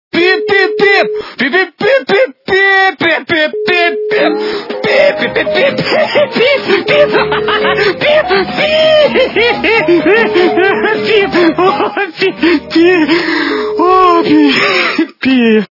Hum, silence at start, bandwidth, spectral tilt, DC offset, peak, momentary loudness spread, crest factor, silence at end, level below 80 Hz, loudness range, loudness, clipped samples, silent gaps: none; 0.15 s; 6 kHz; -5.5 dB/octave; under 0.1%; 0 dBFS; 5 LU; 10 dB; 0.05 s; -46 dBFS; 2 LU; -10 LUFS; 0.3%; none